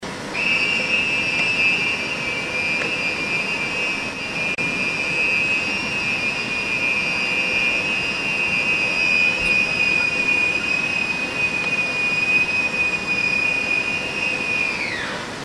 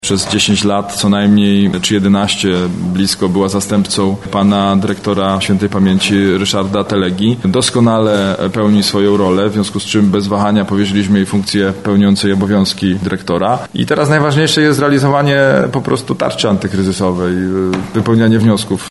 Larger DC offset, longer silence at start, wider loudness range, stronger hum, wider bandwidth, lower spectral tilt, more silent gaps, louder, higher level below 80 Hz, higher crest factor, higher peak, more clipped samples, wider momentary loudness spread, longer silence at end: second, under 0.1% vs 0.3%; about the same, 0 s vs 0.05 s; about the same, 3 LU vs 1 LU; neither; about the same, 13 kHz vs 12 kHz; second, -2.5 dB/octave vs -5 dB/octave; neither; second, -19 LUFS vs -12 LUFS; second, -50 dBFS vs -44 dBFS; about the same, 14 dB vs 12 dB; second, -6 dBFS vs 0 dBFS; neither; about the same, 5 LU vs 5 LU; about the same, 0 s vs 0 s